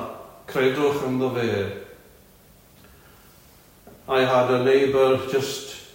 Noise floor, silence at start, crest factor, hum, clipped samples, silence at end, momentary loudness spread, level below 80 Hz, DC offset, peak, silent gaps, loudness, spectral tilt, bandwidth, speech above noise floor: -52 dBFS; 0 s; 16 dB; none; under 0.1%; 0.1 s; 15 LU; -58 dBFS; under 0.1%; -8 dBFS; none; -22 LUFS; -5.5 dB/octave; 16.5 kHz; 31 dB